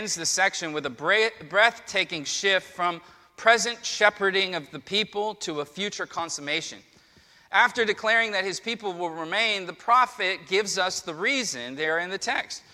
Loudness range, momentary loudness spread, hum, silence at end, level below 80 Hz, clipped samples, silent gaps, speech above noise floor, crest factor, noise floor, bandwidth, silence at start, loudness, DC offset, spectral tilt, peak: 3 LU; 9 LU; none; 0.15 s; -70 dBFS; under 0.1%; none; 31 dB; 22 dB; -57 dBFS; 15 kHz; 0 s; -25 LUFS; under 0.1%; -1.5 dB/octave; -4 dBFS